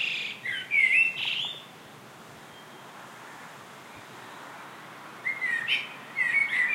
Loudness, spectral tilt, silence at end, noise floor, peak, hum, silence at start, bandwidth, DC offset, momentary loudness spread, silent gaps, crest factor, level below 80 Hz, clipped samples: -25 LUFS; -1 dB/octave; 0 s; -48 dBFS; -12 dBFS; none; 0 s; 16 kHz; under 0.1%; 25 LU; none; 18 dB; -80 dBFS; under 0.1%